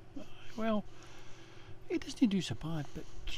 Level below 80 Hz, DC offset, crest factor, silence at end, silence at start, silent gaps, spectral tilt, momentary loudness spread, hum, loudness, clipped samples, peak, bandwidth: -52 dBFS; under 0.1%; 20 dB; 0 s; 0 s; none; -6 dB/octave; 22 LU; none; -36 LUFS; under 0.1%; -16 dBFS; 14 kHz